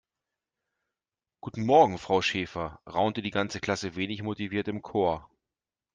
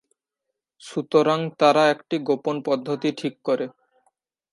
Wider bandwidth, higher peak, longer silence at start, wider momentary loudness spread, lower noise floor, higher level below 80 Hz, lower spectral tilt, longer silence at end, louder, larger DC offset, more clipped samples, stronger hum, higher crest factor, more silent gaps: second, 9.6 kHz vs 11.5 kHz; second, -8 dBFS vs -4 dBFS; first, 1.45 s vs 0.85 s; about the same, 13 LU vs 11 LU; first, under -90 dBFS vs -83 dBFS; first, -60 dBFS vs -78 dBFS; about the same, -5.5 dB/octave vs -5.5 dB/octave; about the same, 0.75 s vs 0.85 s; second, -28 LUFS vs -22 LUFS; neither; neither; neither; about the same, 22 dB vs 18 dB; neither